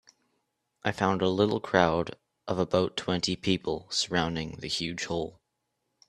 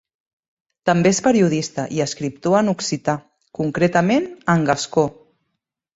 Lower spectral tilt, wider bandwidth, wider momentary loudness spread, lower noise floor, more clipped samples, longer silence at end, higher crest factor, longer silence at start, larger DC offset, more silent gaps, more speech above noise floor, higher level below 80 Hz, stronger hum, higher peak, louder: about the same, -4.5 dB/octave vs -5.5 dB/octave; first, 12 kHz vs 8 kHz; about the same, 9 LU vs 9 LU; about the same, -80 dBFS vs -77 dBFS; neither; about the same, 0.8 s vs 0.85 s; first, 26 dB vs 18 dB; about the same, 0.85 s vs 0.85 s; neither; neither; second, 52 dB vs 59 dB; about the same, -58 dBFS vs -56 dBFS; neither; about the same, -4 dBFS vs -2 dBFS; second, -29 LUFS vs -19 LUFS